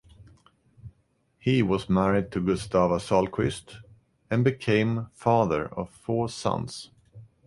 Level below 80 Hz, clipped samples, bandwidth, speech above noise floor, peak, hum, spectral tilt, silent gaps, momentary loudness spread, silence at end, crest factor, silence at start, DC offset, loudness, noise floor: -50 dBFS; under 0.1%; 11.5 kHz; 43 dB; -8 dBFS; none; -6.5 dB/octave; none; 10 LU; 0.2 s; 18 dB; 0.2 s; under 0.1%; -26 LUFS; -68 dBFS